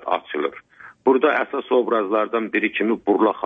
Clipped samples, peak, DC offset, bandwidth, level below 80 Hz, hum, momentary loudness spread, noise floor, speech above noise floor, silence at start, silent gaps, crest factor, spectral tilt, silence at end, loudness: under 0.1%; -6 dBFS; under 0.1%; 3.8 kHz; -68 dBFS; none; 7 LU; -44 dBFS; 24 dB; 0.05 s; none; 16 dB; -7.5 dB/octave; 0 s; -21 LUFS